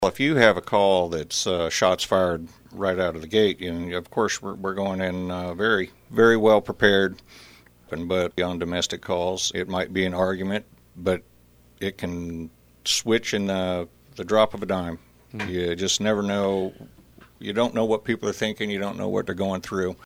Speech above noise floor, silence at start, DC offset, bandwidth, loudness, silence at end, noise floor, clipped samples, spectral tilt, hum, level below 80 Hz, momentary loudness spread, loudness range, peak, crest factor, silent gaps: 31 dB; 0 s; under 0.1%; over 20 kHz; -24 LUFS; 0.1 s; -55 dBFS; under 0.1%; -4 dB/octave; none; -54 dBFS; 13 LU; 5 LU; -2 dBFS; 22 dB; none